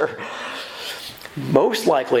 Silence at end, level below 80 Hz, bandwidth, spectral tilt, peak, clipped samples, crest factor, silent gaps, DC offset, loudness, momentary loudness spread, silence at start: 0 s; -60 dBFS; 17.5 kHz; -5 dB/octave; 0 dBFS; under 0.1%; 22 dB; none; under 0.1%; -22 LUFS; 13 LU; 0 s